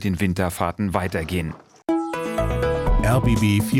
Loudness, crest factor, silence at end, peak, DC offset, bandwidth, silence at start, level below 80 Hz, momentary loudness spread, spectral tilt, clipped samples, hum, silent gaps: -22 LUFS; 16 dB; 0 s; -4 dBFS; under 0.1%; 17 kHz; 0 s; -30 dBFS; 7 LU; -6.5 dB/octave; under 0.1%; none; none